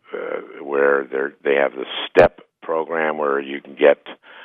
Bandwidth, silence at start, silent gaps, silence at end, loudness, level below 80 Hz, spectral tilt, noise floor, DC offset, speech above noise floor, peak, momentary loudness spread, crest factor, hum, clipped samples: 6.8 kHz; 0.1 s; none; 0 s; -20 LUFS; -50 dBFS; -6.5 dB/octave; -41 dBFS; under 0.1%; 23 dB; 0 dBFS; 14 LU; 20 dB; none; under 0.1%